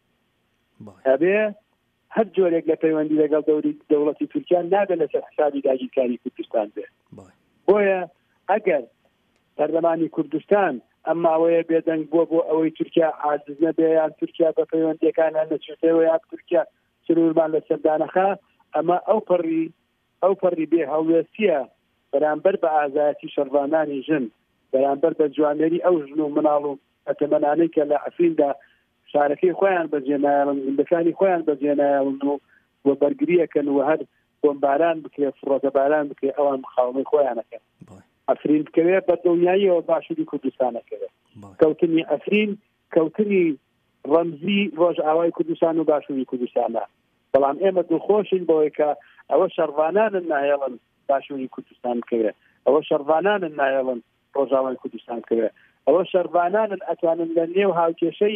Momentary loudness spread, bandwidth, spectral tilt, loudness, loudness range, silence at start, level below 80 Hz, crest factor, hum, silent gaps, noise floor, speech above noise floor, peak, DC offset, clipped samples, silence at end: 8 LU; 3.7 kHz; -9.5 dB/octave; -21 LUFS; 2 LU; 0.8 s; -74 dBFS; 16 dB; none; none; -68 dBFS; 48 dB; -6 dBFS; under 0.1%; under 0.1%; 0 s